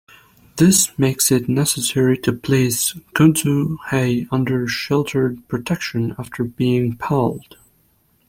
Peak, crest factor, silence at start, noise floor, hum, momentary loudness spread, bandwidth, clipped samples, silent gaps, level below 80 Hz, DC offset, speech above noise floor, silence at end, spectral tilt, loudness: -2 dBFS; 18 dB; 0.55 s; -60 dBFS; none; 9 LU; 16.5 kHz; under 0.1%; none; -50 dBFS; under 0.1%; 42 dB; 0.9 s; -4.5 dB/octave; -18 LUFS